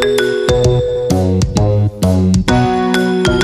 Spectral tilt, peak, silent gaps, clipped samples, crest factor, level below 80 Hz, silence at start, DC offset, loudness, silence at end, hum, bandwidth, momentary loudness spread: -6 dB/octave; 0 dBFS; none; under 0.1%; 12 dB; -26 dBFS; 0 s; under 0.1%; -13 LUFS; 0 s; none; 15 kHz; 2 LU